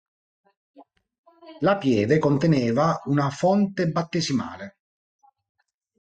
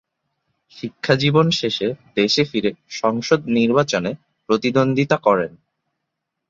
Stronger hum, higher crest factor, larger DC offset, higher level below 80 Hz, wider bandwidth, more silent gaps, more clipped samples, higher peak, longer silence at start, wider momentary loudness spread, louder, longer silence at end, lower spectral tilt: neither; about the same, 16 dB vs 18 dB; neither; about the same, -60 dBFS vs -58 dBFS; first, 9 kHz vs 7.8 kHz; first, 1.19-1.24 s vs none; neither; second, -8 dBFS vs -2 dBFS; about the same, 0.8 s vs 0.75 s; second, 7 LU vs 11 LU; second, -22 LUFS vs -19 LUFS; first, 1.35 s vs 1 s; about the same, -6.5 dB/octave vs -5.5 dB/octave